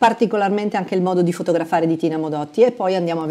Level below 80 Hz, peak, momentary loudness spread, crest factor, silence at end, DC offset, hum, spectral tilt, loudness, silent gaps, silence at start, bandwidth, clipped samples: -66 dBFS; -4 dBFS; 5 LU; 14 dB; 0 s; under 0.1%; none; -7 dB/octave; -19 LUFS; none; 0 s; 13.5 kHz; under 0.1%